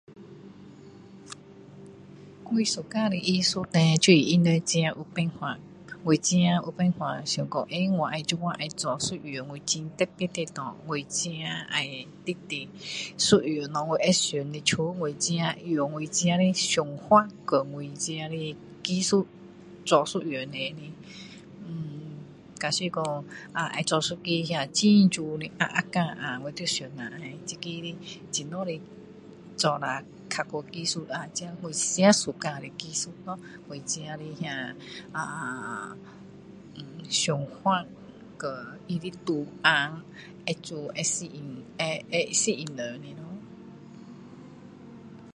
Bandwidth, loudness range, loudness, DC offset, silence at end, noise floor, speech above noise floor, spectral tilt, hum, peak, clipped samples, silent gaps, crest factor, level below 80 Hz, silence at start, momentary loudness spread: 11.5 kHz; 9 LU; -27 LUFS; under 0.1%; 0.05 s; -48 dBFS; 21 dB; -4 dB/octave; none; -4 dBFS; under 0.1%; none; 24 dB; -66 dBFS; 0.1 s; 22 LU